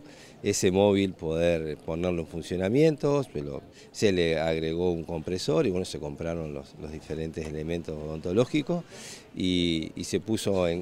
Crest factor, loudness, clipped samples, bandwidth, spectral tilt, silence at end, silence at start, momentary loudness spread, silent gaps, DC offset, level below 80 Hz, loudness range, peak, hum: 20 dB; -28 LUFS; under 0.1%; 16 kHz; -5.5 dB/octave; 0 s; 0 s; 13 LU; none; under 0.1%; -50 dBFS; 5 LU; -8 dBFS; none